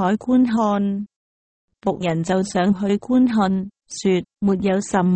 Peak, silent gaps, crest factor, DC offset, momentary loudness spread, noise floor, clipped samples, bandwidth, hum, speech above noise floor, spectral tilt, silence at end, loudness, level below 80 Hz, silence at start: -6 dBFS; 1.16-1.68 s; 14 dB; under 0.1%; 8 LU; under -90 dBFS; under 0.1%; 8.8 kHz; none; over 71 dB; -6.5 dB/octave; 0 s; -20 LUFS; -52 dBFS; 0 s